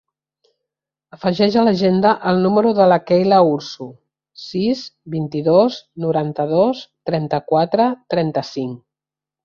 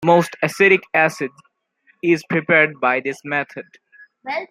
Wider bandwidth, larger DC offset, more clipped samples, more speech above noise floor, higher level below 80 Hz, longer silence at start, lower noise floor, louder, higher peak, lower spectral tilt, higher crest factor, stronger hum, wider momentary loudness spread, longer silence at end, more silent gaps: second, 7 kHz vs 15.5 kHz; neither; neither; first, 71 dB vs 42 dB; first, -58 dBFS vs -66 dBFS; first, 1.25 s vs 0 s; first, -88 dBFS vs -60 dBFS; about the same, -17 LUFS vs -18 LUFS; about the same, -2 dBFS vs -2 dBFS; first, -7.5 dB/octave vs -5.5 dB/octave; about the same, 16 dB vs 18 dB; neither; about the same, 13 LU vs 15 LU; first, 0.7 s vs 0.05 s; neither